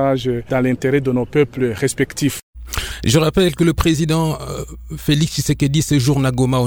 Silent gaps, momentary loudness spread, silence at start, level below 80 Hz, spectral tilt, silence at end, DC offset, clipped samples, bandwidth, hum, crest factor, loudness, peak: 2.43-2.53 s; 10 LU; 0 s; -34 dBFS; -5.5 dB/octave; 0 s; under 0.1%; under 0.1%; 20 kHz; none; 16 dB; -17 LUFS; 0 dBFS